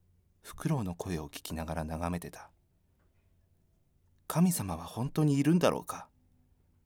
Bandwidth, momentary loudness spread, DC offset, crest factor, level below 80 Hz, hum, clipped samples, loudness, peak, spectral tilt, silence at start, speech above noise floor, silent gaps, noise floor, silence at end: 19 kHz; 17 LU; under 0.1%; 22 dB; -54 dBFS; none; under 0.1%; -32 LUFS; -12 dBFS; -6 dB/octave; 0.45 s; 38 dB; none; -70 dBFS; 0.8 s